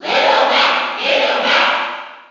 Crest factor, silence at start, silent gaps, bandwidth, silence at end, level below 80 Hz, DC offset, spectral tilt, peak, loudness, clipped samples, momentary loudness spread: 12 dB; 0 s; none; 7.8 kHz; 0.1 s; -62 dBFS; under 0.1%; -1.5 dB/octave; -2 dBFS; -14 LUFS; under 0.1%; 8 LU